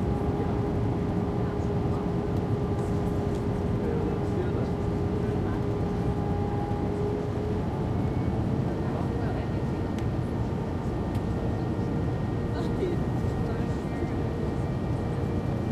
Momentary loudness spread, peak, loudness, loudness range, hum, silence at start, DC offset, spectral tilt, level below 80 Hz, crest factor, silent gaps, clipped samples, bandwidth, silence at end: 2 LU; -16 dBFS; -29 LUFS; 1 LU; none; 0 s; under 0.1%; -9 dB/octave; -38 dBFS; 12 dB; none; under 0.1%; 12.5 kHz; 0 s